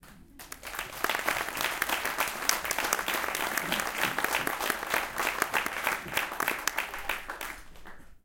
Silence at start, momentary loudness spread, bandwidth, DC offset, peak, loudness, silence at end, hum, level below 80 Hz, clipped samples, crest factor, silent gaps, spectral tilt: 0.05 s; 10 LU; 17 kHz; under 0.1%; -2 dBFS; -30 LUFS; 0.05 s; none; -56 dBFS; under 0.1%; 30 dB; none; -1 dB/octave